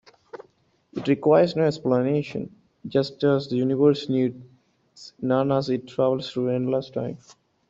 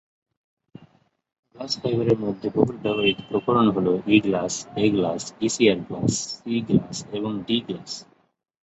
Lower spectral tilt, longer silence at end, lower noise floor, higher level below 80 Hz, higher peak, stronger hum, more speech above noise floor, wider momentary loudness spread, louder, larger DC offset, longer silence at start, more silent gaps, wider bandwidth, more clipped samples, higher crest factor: first, -7.5 dB/octave vs -5 dB/octave; about the same, 0.55 s vs 0.6 s; first, -63 dBFS vs -59 dBFS; second, -64 dBFS vs -56 dBFS; second, -6 dBFS vs -2 dBFS; neither; first, 40 dB vs 36 dB; first, 18 LU vs 10 LU; about the same, -23 LUFS vs -23 LUFS; neither; second, 0.35 s vs 1.55 s; neither; about the same, 7.8 kHz vs 8.4 kHz; neither; about the same, 18 dB vs 22 dB